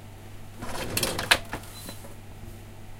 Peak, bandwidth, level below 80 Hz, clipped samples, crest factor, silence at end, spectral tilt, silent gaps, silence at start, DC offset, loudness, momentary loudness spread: 0 dBFS; 17 kHz; -46 dBFS; under 0.1%; 32 dB; 0 s; -2 dB/octave; none; 0 s; under 0.1%; -27 LUFS; 22 LU